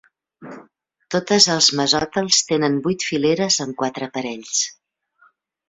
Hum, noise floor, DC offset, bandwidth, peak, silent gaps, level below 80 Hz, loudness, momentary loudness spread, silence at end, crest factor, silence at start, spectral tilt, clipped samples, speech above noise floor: none; -59 dBFS; under 0.1%; 8.4 kHz; -2 dBFS; none; -58 dBFS; -18 LUFS; 12 LU; 0.95 s; 20 dB; 0.4 s; -2.5 dB/octave; under 0.1%; 39 dB